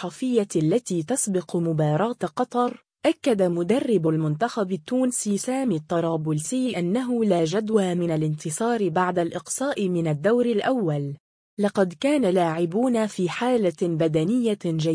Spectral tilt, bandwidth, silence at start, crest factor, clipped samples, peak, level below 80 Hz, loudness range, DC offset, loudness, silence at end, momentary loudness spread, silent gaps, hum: -6 dB/octave; 10.5 kHz; 0 s; 14 dB; under 0.1%; -8 dBFS; -66 dBFS; 1 LU; under 0.1%; -24 LUFS; 0 s; 5 LU; 11.20-11.57 s; none